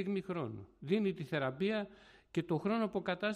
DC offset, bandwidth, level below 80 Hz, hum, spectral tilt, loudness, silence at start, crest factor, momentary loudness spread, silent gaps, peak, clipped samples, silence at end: under 0.1%; 11 kHz; -70 dBFS; none; -7.5 dB/octave; -37 LUFS; 0 s; 16 dB; 7 LU; none; -20 dBFS; under 0.1%; 0 s